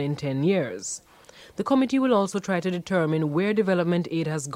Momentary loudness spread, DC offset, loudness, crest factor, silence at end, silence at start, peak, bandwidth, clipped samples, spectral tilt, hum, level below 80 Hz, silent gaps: 11 LU; under 0.1%; -25 LUFS; 16 dB; 0 s; 0 s; -8 dBFS; 15 kHz; under 0.1%; -6 dB/octave; none; -64 dBFS; none